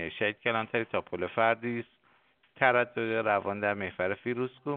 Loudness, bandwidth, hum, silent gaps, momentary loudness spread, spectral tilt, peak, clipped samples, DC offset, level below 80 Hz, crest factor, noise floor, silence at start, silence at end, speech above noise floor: -30 LUFS; 4.5 kHz; none; none; 8 LU; -3 dB/octave; -8 dBFS; under 0.1%; under 0.1%; -70 dBFS; 22 dB; -67 dBFS; 0 s; 0 s; 37 dB